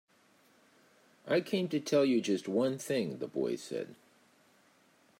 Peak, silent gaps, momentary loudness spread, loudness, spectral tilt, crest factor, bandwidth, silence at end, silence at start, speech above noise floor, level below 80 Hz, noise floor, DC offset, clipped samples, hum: -18 dBFS; none; 12 LU; -33 LUFS; -5.5 dB/octave; 18 dB; 16 kHz; 1.25 s; 1.25 s; 35 dB; -84 dBFS; -67 dBFS; under 0.1%; under 0.1%; none